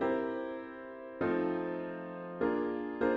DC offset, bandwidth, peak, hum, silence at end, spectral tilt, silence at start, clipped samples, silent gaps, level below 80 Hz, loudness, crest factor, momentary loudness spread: under 0.1%; 5.4 kHz; -18 dBFS; none; 0 s; -9 dB/octave; 0 s; under 0.1%; none; -66 dBFS; -36 LUFS; 16 dB; 11 LU